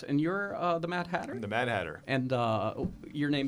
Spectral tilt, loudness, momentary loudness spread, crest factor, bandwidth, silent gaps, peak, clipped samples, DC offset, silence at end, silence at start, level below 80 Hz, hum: -7 dB/octave; -32 LUFS; 5 LU; 16 dB; 12 kHz; none; -16 dBFS; under 0.1%; under 0.1%; 0 s; 0 s; -58 dBFS; none